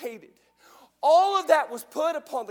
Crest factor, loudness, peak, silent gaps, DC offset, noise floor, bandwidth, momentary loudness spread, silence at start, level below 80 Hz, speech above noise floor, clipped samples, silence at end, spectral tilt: 18 dB; -23 LUFS; -6 dBFS; none; under 0.1%; -56 dBFS; 18.5 kHz; 12 LU; 0 s; -82 dBFS; 32 dB; under 0.1%; 0.05 s; -1.5 dB/octave